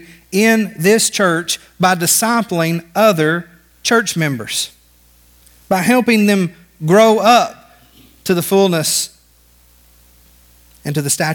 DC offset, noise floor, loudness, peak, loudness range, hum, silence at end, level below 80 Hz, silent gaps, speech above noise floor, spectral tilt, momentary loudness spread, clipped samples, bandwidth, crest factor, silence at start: under 0.1%; -50 dBFS; -14 LUFS; 0 dBFS; 5 LU; 60 Hz at -45 dBFS; 0 s; -54 dBFS; none; 37 dB; -4 dB/octave; 11 LU; under 0.1%; 19.5 kHz; 16 dB; 0.3 s